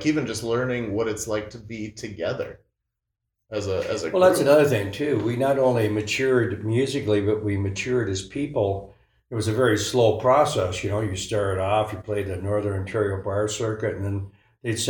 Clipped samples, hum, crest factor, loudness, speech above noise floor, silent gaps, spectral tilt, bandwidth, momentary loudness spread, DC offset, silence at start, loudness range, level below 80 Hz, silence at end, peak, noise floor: under 0.1%; none; 20 dB; -24 LUFS; 59 dB; none; -5.5 dB/octave; 18 kHz; 12 LU; under 0.1%; 0 s; 7 LU; -54 dBFS; 0 s; -4 dBFS; -82 dBFS